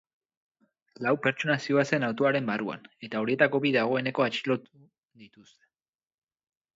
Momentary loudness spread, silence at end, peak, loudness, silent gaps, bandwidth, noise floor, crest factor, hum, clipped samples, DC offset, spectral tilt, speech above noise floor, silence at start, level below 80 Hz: 8 LU; 1.5 s; -8 dBFS; -27 LUFS; 4.98-5.03 s; 7.8 kHz; under -90 dBFS; 22 dB; none; under 0.1%; under 0.1%; -6 dB/octave; over 63 dB; 1 s; -76 dBFS